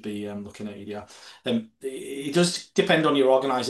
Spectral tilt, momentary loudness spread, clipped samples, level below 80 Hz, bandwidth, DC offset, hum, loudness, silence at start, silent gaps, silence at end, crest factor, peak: -4.5 dB/octave; 17 LU; under 0.1%; -64 dBFS; 12.5 kHz; under 0.1%; none; -24 LUFS; 0.05 s; none; 0 s; 20 dB; -6 dBFS